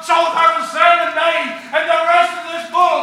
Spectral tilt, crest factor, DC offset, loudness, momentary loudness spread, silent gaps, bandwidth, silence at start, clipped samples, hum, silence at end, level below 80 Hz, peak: -1.5 dB/octave; 14 dB; under 0.1%; -14 LUFS; 8 LU; none; 13.5 kHz; 0 s; under 0.1%; 60 Hz at -55 dBFS; 0 s; -76 dBFS; 0 dBFS